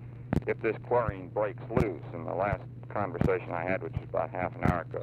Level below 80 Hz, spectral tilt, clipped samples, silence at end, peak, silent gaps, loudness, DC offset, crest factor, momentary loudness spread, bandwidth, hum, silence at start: -46 dBFS; -9 dB/octave; under 0.1%; 0 s; -10 dBFS; none; -32 LUFS; under 0.1%; 22 dB; 5 LU; 13 kHz; none; 0 s